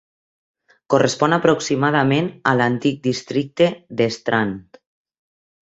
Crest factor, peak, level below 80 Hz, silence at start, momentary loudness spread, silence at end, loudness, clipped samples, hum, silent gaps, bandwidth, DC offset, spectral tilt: 18 dB; -2 dBFS; -58 dBFS; 0.9 s; 7 LU; 1.05 s; -19 LUFS; under 0.1%; none; none; 8.2 kHz; under 0.1%; -5.5 dB/octave